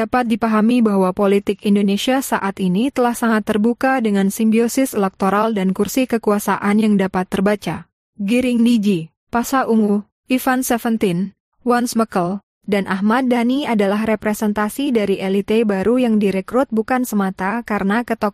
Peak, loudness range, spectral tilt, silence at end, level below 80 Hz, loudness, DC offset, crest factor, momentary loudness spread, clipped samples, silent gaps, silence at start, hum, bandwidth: -6 dBFS; 2 LU; -5.5 dB/octave; 0 s; -52 dBFS; -18 LUFS; under 0.1%; 12 dB; 5 LU; under 0.1%; 7.93-8.13 s, 9.17-9.27 s, 10.12-10.23 s, 11.40-11.52 s, 12.43-12.61 s; 0 s; none; 15.5 kHz